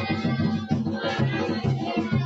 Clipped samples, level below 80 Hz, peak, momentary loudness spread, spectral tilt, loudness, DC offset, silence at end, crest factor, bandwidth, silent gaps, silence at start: under 0.1%; -52 dBFS; -12 dBFS; 2 LU; -7.5 dB/octave; -26 LUFS; under 0.1%; 0 s; 14 dB; 7.8 kHz; none; 0 s